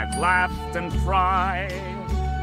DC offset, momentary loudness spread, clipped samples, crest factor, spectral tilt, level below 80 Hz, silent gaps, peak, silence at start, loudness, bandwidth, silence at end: under 0.1%; 9 LU; under 0.1%; 16 dB; -5.5 dB/octave; -30 dBFS; none; -8 dBFS; 0 s; -23 LUFS; 14 kHz; 0 s